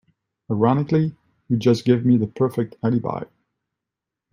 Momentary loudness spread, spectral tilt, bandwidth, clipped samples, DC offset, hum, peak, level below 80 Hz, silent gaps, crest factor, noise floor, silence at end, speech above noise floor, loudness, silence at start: 11 LU; -8.5 dB/octave; 11.5 kHz; under 0.1%; under 0.1%; none; -4 dBFS; -62 dBFS; none; 18 dB; -85 dBFS; 1.1 s; 66 dB; -21 LUFS; 0.5 s